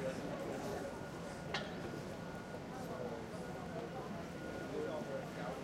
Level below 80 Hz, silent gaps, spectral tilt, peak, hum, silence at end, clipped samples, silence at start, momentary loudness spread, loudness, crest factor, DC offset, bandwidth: -64 dBFS; none; -5.5 dB/octave; -24 dBFS; none; 0 s; under 0.1%; 0 s; 4 LU; -45 LUFS; 20 dB; under 0.1%; 16 kHz